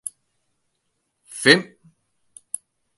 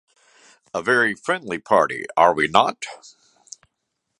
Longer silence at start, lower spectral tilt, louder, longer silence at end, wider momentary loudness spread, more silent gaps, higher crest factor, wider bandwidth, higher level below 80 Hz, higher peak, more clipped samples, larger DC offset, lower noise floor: first, 1.35 s vs 0.75 s; about the same, -3 dB/octave vs -3.5 dB/octave; first, -17 LUFS vs -20 LUFS; about the same, 1.35 s vs 1.25 s; first, 23 LU vs 12 LU; neither; about the same, 26 dB vs 22 dB; about the same, 12 kHz vs 11.5 kHz; second, -74 dBFS vs -62 dBFS; about the same, 0 dBFS vs 0 dBFS; neither; neither; about the same, -74 dBFS vs -77 dBFS